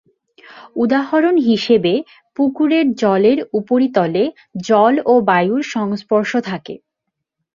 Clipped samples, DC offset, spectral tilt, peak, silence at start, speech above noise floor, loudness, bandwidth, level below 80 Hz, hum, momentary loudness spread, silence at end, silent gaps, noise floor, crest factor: under 0.1%; under 0.1%; -6.5 dB/octave; 0 dBFS; 0.55 s; 63 dB; -16 LUFS; 7.4 kHz; -60 dBFS; none; 12 LU; 0.8 s; none; -78 dBFS; 16 dB